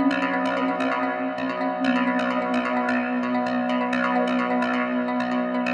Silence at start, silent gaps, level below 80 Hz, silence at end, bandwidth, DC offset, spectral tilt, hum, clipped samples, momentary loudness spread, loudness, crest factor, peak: 0 s; none; -62 dBFS; 0 s; 8.6 kHz; under 0.1%; -6 dB/octave; none; under 0.1%; 3 LU; -24 LUFS; 14 dB; -10 dBFS